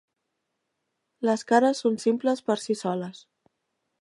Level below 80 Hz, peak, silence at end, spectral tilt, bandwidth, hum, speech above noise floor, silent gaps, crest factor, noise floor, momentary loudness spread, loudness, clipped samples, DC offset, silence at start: -80 dBFS; -8 dBFS; 0.9 s; -5 dB/octave; 11.5 kHz; none; 56 dB; none; 20 dB; -80 dBFS; 9 LU; -25 LUFS; under 0.1%; under 0.1%; 1.2 s